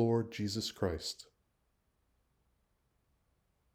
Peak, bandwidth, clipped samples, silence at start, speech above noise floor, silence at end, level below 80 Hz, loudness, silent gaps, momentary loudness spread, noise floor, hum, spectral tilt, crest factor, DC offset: -18 dBFS; 16 kHz; under 0.1%; 0 s; 43 dB; 2.5 s; -64 dBFS; -37 LUFS; none; 9 LU; -78 dBFS; none; -5.5 dB/octave; 22 dB; under 0.1%